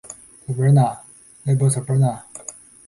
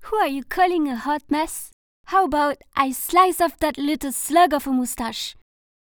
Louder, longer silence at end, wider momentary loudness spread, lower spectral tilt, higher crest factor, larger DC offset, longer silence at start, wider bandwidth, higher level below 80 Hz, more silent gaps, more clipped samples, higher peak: about the same, -19 LUFS vs -21 LUFS; second, 0.35 s vs 0.7 s; first, 20 LU vs 10 LU; first, -7.5 dB/octave vs -2.5 dB/octave; about the same, 14 dB vs 18 dB; neither; about the same, 0.05 s vs 0 s; second, 11.5 kHz vs over 20 kHz; second, -56 dBFS vs -48 dBFS; second, none vs 1.73-2.04 s; neither; about the same, -6 dBFS vs -4 dBFS